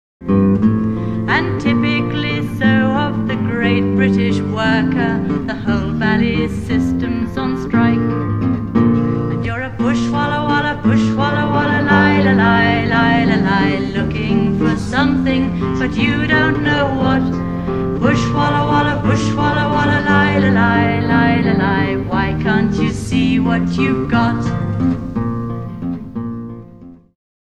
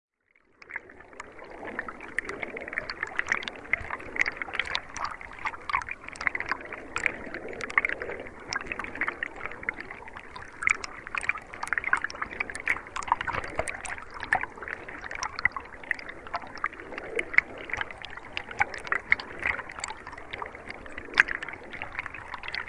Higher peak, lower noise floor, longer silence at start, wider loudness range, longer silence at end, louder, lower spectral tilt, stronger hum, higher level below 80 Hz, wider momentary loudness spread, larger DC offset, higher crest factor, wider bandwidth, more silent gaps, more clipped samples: about the same, 0 dBFS vs 0 dBFS; second, -39 dBFS vs -66 dBFS; second, 0.2 s vs 0.6 s; about the same, 3 LU vs 3 LU; first, 0.55 s vs 0 s; first, -16 LUFS vs -31 LUFS; first, -7 dB/octave vs -2.5 dB/octave; neither; first, -34 dBFS vs -54 dBFS; second, 7 LU vs 14 LU; neither; second, 16 dB vs 32 dB; second, 10 kHz vs 11.5 kHz; neither; neither